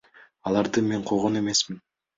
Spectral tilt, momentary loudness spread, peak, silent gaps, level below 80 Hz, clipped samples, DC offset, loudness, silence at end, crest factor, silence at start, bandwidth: -4 dB/octave; 10 LU; -10 dBFS; none; -60 dBFS; under 0.1%; under 0.1%; -25 LUFS; 0.4 s; 16 dB; 0.45 s; 8 kHz